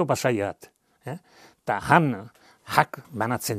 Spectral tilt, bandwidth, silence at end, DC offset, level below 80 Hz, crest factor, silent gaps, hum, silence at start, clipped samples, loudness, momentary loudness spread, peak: -5 dB/octave; 15 kHz; 0 s; under 0.1%; -60 dBFS; 26 dB; none; none; 0 s; under 0.1%; -24 LUFS; 19 LU; 0 dBFS